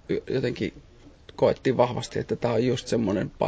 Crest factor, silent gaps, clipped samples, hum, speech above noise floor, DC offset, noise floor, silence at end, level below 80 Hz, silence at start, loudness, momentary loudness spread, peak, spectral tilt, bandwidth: 20 dB; none; under 0.1%; none; 21 dB; under 0.1%; -46 dBFS; 0 s; -50 dBFS; 0.1 s; -26 LUFS; 8 LU; -6 dBFS; -6.5 dB/octave; 8 kHz